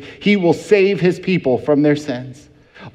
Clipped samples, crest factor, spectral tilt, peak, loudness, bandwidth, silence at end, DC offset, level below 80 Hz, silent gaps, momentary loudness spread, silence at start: under 0.1%; 16 dB; -7 dB/octave; 0 dBFS; -16 LUFS; 11.5 kHz; 0.05 s; under 0.1%; -56 dBFS; none; 11 LU; 0 s